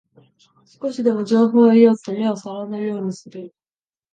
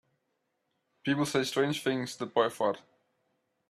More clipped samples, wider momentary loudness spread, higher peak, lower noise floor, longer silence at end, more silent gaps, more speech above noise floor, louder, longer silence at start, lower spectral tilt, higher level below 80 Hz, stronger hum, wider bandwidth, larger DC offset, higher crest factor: neither; first, 18 LU vs 6 LU; first, -2 dBFS vs -12 dBFS; first, under -90 dBFS vs -80 dBFS; second, 0.65 s vs 0.9 s; neither; first, over 72 dB vs 50 dB; first, -18 LUFS vs -30 LUFS; second, 0.8 s vs 1.05 s; first, -7 dB/octave vs -4.5 dB/octave; about the same, -72 dBFS vs -74 dBFS; neither; second, 8.6 kHz vs 14.5 kHz; neither; about the same, 18 dB vs 20 dB